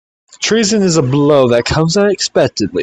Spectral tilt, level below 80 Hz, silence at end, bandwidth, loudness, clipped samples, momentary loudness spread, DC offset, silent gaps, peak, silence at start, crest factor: -4.5 dB/octave; -40 dBFS; 0 s; 9.4 kHz; -12 LUFS; under 0.1%; 4 LU; under 0.1%; none; 0 dBFS; 0.4 s; 12 dB